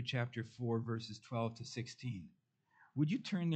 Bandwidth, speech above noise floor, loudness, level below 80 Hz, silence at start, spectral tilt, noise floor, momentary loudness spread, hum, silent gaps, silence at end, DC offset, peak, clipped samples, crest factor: 8.6 kHz; 32 dB; -41 LUFS; -78 dBFS; 0 s; -6.5 dB/octave; -71 dBFS; 9 LU; none; none; 0 s; under 0.1%; -22 dBFS; under 0.1%; 18 dB